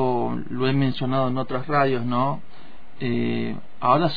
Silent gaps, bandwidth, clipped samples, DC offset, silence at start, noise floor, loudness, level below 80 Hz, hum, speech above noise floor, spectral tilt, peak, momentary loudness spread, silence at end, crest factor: none; 5 kHz; under 0.1%; 4%; 0 s; -49 dBFS; -24 LUFS; -56 dBFS; none; 26 dB; -9.5 dB/octave; -4 dBFS; 7 LU; 0 s; 18 dB